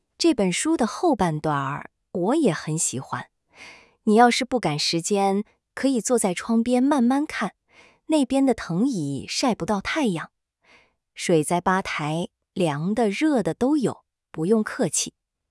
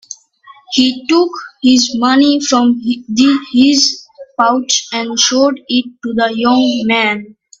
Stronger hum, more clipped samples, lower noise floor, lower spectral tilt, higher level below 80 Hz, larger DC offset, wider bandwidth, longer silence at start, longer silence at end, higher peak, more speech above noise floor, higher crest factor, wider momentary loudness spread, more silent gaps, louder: neither; neither; first, -59 dBFS vs -43 dBFS; first, -4.5 dB/octave vs -2 dB/octave; about the same, -56 dBFS vs -56 dBFS; neither; first, 12 kHz vs 7.8 kHz; about the same, 0.2 s vs 0.1 s; about the same, 0.4 s vs 0.35 s; second, -4 dBFS vs 0 dBFS; first, 36 dB vs 31 dB; first, 20 dB vs 14 dB; first, 10 LU vs 7 LU; neither; second, -23 LUFS vs -12 LUFS